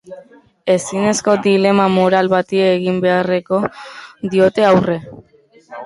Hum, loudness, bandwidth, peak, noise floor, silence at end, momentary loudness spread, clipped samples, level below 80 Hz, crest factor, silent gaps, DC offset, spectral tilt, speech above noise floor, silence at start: none; -15 LUFS; 11.5 kHz; -2 dBFS; -50 dBFS; 0 s; 12 LU; under 0.1%; -54 dBFS; 14 dB; none; under 0.1%; -5.5 dB/octave; 35 dB; 0.1 s